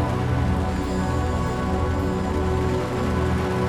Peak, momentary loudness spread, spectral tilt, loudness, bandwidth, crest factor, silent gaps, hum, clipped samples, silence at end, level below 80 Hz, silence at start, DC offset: -12 dBFS; 2 LU; -7 dB/octave; -24 LUFS; 13.5 kHz; 12 dB; none; none; under 0.1%; 0 s; -30 dBFS; 0 s; under 0.1%